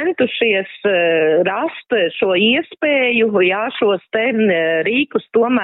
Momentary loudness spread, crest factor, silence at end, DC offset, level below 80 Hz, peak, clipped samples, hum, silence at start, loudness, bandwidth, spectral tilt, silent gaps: 4 LU; 14 dB; 0 s; under 0.1%; -66 dBFS; -2 dBFS; under 0.1%; none; 0 s; -16 LUFS; 4.1 kHz; -2 dB/octave; none